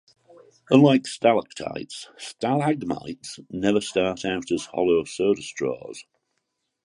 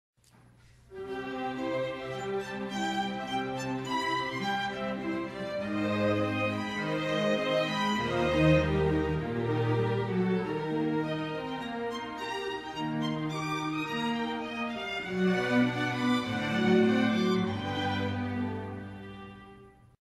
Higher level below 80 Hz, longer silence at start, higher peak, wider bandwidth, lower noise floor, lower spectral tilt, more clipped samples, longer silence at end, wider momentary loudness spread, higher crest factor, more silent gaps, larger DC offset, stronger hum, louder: second, -60 dBFS vs -52 dBFS; second, 0.7 s vs 0.9 s; first, -2 dBFS vs -12 dBFS; second, 11.5 kHz vs 14 kHz; first, -77 dBFS vs -60 dBFS; about the same, -5.5 dB/octave vs -6 dB/octave; neither; first, 0.85 s vs 0.4 s; first, 17 LU vs 9 LU; about the same, 22 dB vs 20 dB; neither; neither; neither; first, -23 LUFS vs -30 LUFS